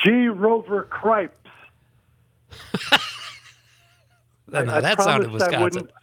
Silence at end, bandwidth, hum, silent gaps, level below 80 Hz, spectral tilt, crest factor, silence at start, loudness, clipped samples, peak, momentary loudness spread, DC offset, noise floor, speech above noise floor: 0.15 s; 19 kHz; none; none; -64 dBFS; -4.5 dB/octave; 22 dB; 0 s; -21 LUFS; under 0.1%; 0 dBFS; 13 LU; under 0.1%; -61 dBFS; 40 dB